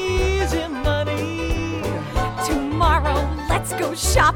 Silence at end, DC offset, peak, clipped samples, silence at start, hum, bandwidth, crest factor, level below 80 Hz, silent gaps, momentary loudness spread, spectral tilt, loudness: 0 s; under 0.1%; -4 dBFS; under 0.1%; 0 s; none; 17.5 kHz; 16 dB; -26 dBFS; none; 6 LU; -4.5 dB/octave; -22 LUFS